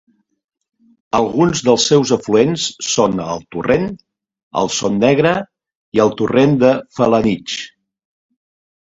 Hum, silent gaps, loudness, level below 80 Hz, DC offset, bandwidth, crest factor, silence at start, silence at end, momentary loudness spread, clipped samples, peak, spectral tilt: none; 4.43-4.51 s, 5.75-5.92 s; -16 LUFS; -48 dBFS; under 0.1%; 8 kHz; 16 dB; 1.15 s; 1.25 s; 11 LU; under 0.1%; 0 dBFS; -4.5 dB/octave